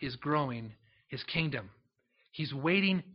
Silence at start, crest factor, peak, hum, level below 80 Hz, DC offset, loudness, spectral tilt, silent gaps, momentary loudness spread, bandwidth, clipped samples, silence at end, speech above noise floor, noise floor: 0 s; 20 dB; -14 dBFS; none; -66 dBFS; under 0.1%; -33 LUFS; -4 dB/octave; none; 16 LU; 5.8 kHz; under 0.1%; 0 s; 41 dB; -74 dBFS